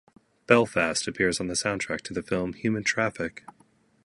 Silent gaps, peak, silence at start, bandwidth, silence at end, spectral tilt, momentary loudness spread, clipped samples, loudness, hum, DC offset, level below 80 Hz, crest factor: none; -2 dBFS; 0.5 s; 11.5 kHz; 0.65 s; -4 dB/octave; 9 LU; under 0.1%; -26 LUFS; none; under 0.1%; -56 dBFS; 26 dB